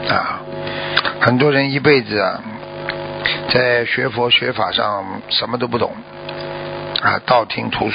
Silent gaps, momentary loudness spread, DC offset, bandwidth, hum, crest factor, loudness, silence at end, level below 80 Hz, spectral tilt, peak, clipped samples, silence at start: none; 13 LU; under 0.1%; 5.4 kHz; none; 18 dB; -17 LUFS; 0 s; -48 dBFS; -8 dB/octave; 0 dBFS; under 0.1%; 0 s